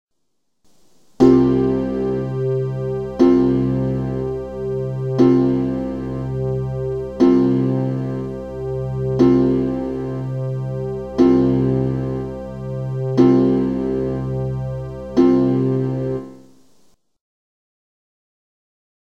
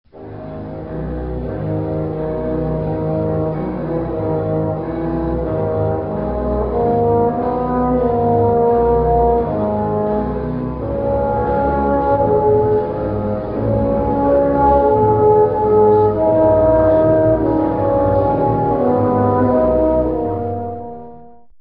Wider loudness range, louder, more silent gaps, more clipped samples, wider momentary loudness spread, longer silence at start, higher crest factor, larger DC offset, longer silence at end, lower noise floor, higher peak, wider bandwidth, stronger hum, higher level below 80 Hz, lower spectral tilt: second, 3 LU vs 7 LU; second, -19 LUFS vs -16 LUFS; neither; neither; about the same, 12 LU vs 10 LU; first, 1.2 s vs 0.15 s; about the same, 18 dB vs 14 dB; first, 0.3% vs under 0.1%; first, 2.75 s vs 0.1 s; first, -75 dBFS vs -42 dBFS; about the same, 0 dBFS vs -2 dBFS; first, 6.6 kHz vs 5 kHz; neither; second, -40 dBFS vs -30 dBFS; second, -9.5 dB/octave vs -11.5 dB/octave